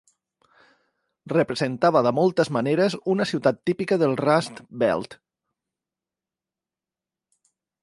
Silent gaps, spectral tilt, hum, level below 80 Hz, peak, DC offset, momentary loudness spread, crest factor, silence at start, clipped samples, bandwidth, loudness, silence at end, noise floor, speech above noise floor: none; -6.5 dB/octave; none; -66 dBFS; -4 dBFS; under 0.1%; 6 LU; 20 dB; 1.25 s; under 0.1%; 11.5 kHz; -22 LUFS; 2.7 s; -90 dBFS; 68 dB